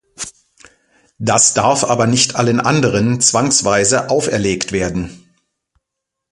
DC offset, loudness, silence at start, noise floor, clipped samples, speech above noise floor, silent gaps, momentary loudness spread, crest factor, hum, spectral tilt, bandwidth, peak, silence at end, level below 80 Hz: under 0.1%; -14 LUFS; 0.2 s; -79 dBFS; under 0.1%; 65 dB; none; 13 LU; 16 dB; none; -3.5 dB/octave; 11.5 kHz; 0 dBFS; 1.15 s; -44 dBFS